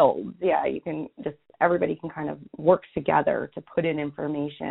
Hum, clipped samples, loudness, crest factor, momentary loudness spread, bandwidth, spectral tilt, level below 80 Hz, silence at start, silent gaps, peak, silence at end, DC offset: none; under 0.1%; -26 LUFS; 20 dB; 11 LU; 4.1 kHz; -5.5 dB/octave; -60 dBFS; 0 s; none; -4 dBFS; 0 s; under 0.1%